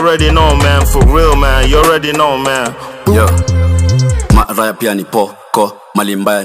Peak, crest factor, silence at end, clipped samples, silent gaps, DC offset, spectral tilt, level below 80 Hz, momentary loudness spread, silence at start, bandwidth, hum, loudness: 0 dBFS; 10 dB; 0 s; under 0.1%; none; under 0.1%; -5 dB/octave; -16 dBFS; 7 LU; 0 s; 16 kHz; none; -11 LUFS